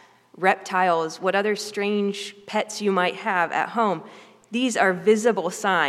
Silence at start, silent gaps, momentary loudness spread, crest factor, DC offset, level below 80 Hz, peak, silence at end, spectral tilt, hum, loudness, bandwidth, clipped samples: 0.35 s; none; 8 LU; 18 dB; under 0.1%; -80 dBFS; -4 dBFS; 0 s; -4 dB/octave; none; -23 LUFS; 14 kHz; under 0.1%